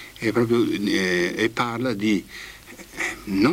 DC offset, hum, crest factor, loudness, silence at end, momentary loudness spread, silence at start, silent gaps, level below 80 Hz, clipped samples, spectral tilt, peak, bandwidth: under 0.1%; none; 16 dB; -23 LUFS; 0 s; 17 LU; 0 s; none; -52 dBFS; under 0.1%; -5 dB/octave; -8 dBFS; 16 kHz